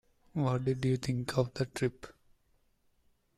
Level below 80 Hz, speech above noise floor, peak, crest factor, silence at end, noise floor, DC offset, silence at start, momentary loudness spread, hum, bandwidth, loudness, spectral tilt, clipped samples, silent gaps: -62 dBFS; 39 dB; -16 dBFS; 20 dB; 1.25 s; -72 dBFS; under 0.1%; 0.35 s; 10 LU; none; 13.5 kHz; -33 LUFS; -6.5 dB/octave; under 0.1%; none